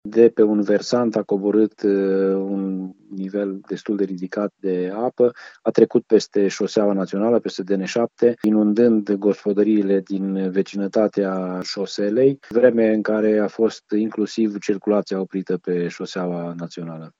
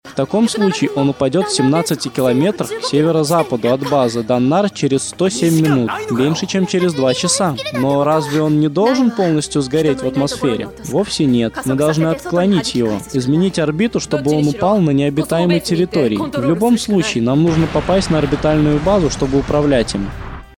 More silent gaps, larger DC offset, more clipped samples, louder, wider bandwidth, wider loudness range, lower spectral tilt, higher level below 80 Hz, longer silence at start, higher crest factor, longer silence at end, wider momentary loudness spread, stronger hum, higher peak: neither; neither; neither; second, -20 LUFS vs -16 LUFS; second, 7.8 kHz vs 19.5 kHz; first, 4 LU vs 1 LU; about the same, -6.5 dB/octave vs -5.5 dB/octave; second, -74 dBFS vs -38 dBFS; about the same, 0.05 s vs 0.05 s; first, 20 dB vs 14 dB; about the same, 0.1 s vs 0.1 s; first, 9 LU vs 4 LU; neither; about the same, 0 dBFS vs -2 dBFS